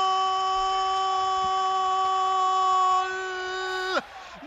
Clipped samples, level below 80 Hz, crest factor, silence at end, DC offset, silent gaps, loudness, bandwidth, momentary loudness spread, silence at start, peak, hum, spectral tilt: under 0.1%; -58 dBFS; 12 dB; 0 s; under 0.1%; none; -25 LUFS; 8.2 kHz; 8 LU; 0 s; -12 dBFS; none; -1.5 dB/octave